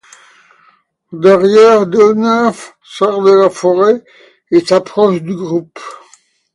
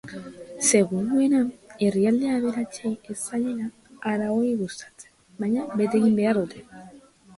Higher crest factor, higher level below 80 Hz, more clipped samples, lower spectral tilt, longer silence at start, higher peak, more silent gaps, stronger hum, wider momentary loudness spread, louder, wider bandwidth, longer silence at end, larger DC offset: second, 12 dB vs 18 dB; about the same, -60 dBFS vs -64 dBFS; neither; about the same, -6 dB/octave vs -5 dB/octave; first, 1.1 s vs 0.05 s; first, 0 dBFS vs -6 dBFS; neither; neither; first, 23 LU vs 15 LU; first, -11 LUFS vs -24 LUFS; about the same, 11.5 kHz vs 11.5 kHz; first, 0.6 s vs 0.4 s; neither